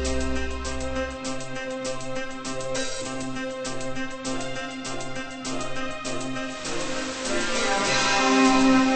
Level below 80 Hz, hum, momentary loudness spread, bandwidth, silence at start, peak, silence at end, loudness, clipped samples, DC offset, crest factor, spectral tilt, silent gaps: -40 dBFS; none; 13 LU; 8.8 kHz; 0 s; -6 dBFS; 0 s; -26 LUFS; under 0.1%; under 0.1%; 20 dB; -3.5 dB/octave; none